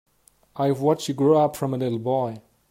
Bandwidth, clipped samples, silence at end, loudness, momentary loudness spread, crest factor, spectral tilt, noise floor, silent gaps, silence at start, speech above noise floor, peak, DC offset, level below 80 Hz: 16 kHz; under 0.1%; 0.3 s; -23 LUFS; 12 LU; 16 dB; -7 dB/octave; -55 dBFS; none; 0.55 s; 33 dB; -6 dBFS; under 0.1%; -64 dBFS